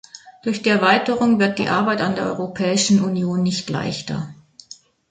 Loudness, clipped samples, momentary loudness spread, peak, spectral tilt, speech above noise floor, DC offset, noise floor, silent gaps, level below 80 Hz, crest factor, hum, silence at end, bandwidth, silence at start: -19 LUFS; under 0.1%; 10 LU; -2 dBFS; -4.5 dB/octave; 27 dB; under 0.1%; -46 dBFS; none; -56 dBFS; 18 dB; none; 0.75 s; 9.4 kHz; 0.15 s